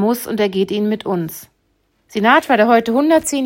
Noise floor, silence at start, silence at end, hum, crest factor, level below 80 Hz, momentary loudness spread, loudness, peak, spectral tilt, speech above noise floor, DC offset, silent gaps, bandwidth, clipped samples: -63 dBFS; 0 s; 0 s; none; 16 dB; -58 dBFS; 12 LU; -15 LUFS; 0 dBFS; -4.5 dB/octave; 48 dB; under 0.1%; none; 16.5 kHz; under 0.1%